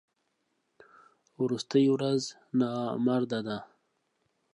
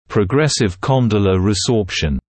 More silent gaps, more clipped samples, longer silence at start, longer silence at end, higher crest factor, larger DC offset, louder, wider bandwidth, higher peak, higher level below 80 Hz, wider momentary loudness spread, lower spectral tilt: neither; neither; first, 1.4 s vs 0.1 s; first, 0.9 s vs 0.2 s; about the same, 18 dB vs 14 dB; neither; second, -29 LUFS vs -16 LUFS; first, 10.5 kHz vs 8.8 kHz; second, -12 dBFS vs -2 dBFS; second, -78 dBFS vs -34 dBFS; first, 9 LU vs 3 LU; about the same, -6 dB/octave vs -5.5 dB/octave